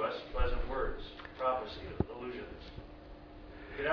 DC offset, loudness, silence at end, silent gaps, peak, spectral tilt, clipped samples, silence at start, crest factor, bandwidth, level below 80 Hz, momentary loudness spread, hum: under 0.1%; -39 LUFS; 0 s; none; -16 dBFS; -4 dB/octave; under 0.1%; 0 s; 22 dB; 5.4 kHz; -42 dBFS; 17 LU; none